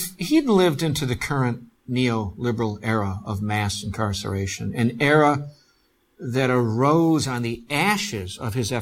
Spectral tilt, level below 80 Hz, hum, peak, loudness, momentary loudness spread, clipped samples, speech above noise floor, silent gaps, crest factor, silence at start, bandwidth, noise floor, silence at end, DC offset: -5.5 dB/octave; -50 dBFS; none; -6 dBFS; -22 LUFS; 10 LU; under 0.1%; 42 dB; none; 18 dB; 0 s; 17.5 kHz; -64 dBFS; 0 s; under 0.1%